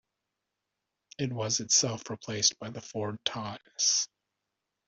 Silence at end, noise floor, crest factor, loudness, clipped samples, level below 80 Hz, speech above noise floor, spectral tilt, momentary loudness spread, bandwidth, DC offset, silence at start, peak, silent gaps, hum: 0.8 s; -86 dBFS; 24 dB; -29 LUFS; under 0.1%; -70 dBFS; 55 dB; -2 dB/octave; 14 LU; 8.2 kHz; under 0.1%; 1.2 s; -10 dBFS; none; none